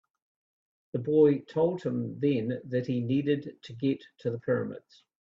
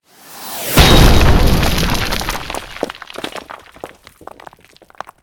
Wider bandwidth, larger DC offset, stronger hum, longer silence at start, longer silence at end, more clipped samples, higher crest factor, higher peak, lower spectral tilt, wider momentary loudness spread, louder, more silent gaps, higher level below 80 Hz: second, 7.2 kHz vs over 20 kHz; neither; neither; first, 0.95 s vs 0.3 s; second, 0.5 s vs 1.35 s; second, under 0.1% vs 0.2%; about the same, 18 dB vs 14 dB; second, -12 dBFS vs 0 dBFS; first, -9 dB/octave vs -4.5 dB/octave; second, 12 LU vs 26 LU; second, -29 LUFS vs -14 LUFS; neither; second, -70 dBFS vs -18 dBFS